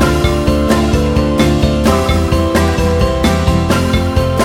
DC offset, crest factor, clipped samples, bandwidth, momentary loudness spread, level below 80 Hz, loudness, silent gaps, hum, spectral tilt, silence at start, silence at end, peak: under 0.1%; 12 dB; under 0.1%; 16.5 kHz; 1 LU; -18 dBFS; -13 LUFS; none; none; -6 dB/octave; 0 s; 0 s; 0 dBFS